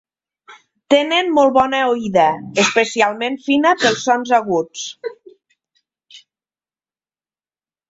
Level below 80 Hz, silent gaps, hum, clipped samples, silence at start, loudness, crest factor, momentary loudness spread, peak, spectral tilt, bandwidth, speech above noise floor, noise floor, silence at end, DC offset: -60 dBFS; none; none; under 0.1%; 0.5 s; -16 LUFS; 18 dB; 11 LU; 0 dBFS; -3.5 dB/octave; 8 kHz; over 74 dB; under -90 dBFS; 1.75 s; under 0.1%